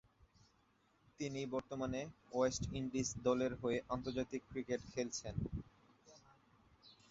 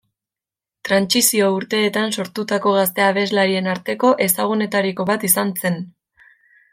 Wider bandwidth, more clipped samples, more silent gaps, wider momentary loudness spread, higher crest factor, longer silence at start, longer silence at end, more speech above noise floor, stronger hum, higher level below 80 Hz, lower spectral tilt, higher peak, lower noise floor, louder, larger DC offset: second, 7.6 kHz vs 16.5 kHz; neither; neither; about the same, 8 LU vs 8 LU; about the same, 20 dB vs 20 dB; first, 1.2 s vs 0.85 s; second, 0.15 s vs 0.85 s; second, 34 dB vs 71 dB; neither; first, -60 dBFS vs -66 dBFS; first, -5.5 dB/octave vs -3.5 dB/octave; second, -22 dBFS vs 0 dBFS; second, -75 dBFS vs -89 dBFS; second, -41 LUFS vs -18 LUFS; neither